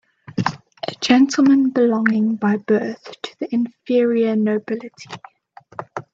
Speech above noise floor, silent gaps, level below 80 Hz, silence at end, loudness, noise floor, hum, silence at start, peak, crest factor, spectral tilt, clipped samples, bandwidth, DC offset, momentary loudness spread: 19 dB; none; -64 dBFS; 0.15 s; -18 LUFS; -37 dBFS; none; 0.35 s; 0 dBFS; 18 dB; -5.5 dB/octave; under 0.1%; 7.8 kHz; under 0.1%; 19 LU